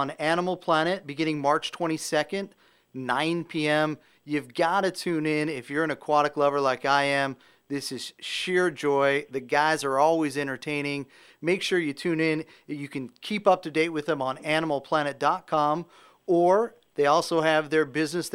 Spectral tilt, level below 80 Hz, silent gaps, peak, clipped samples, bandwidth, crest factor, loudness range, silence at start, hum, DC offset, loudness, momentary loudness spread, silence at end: -4.5 dB/octave; -72 dBFS; none; -6 dBFS; under 0.1%; 16 kHz; 20 dB; 3 LU; 0 s; none; under 0.1%; -26 LUFS; 11 LU; 0.05 s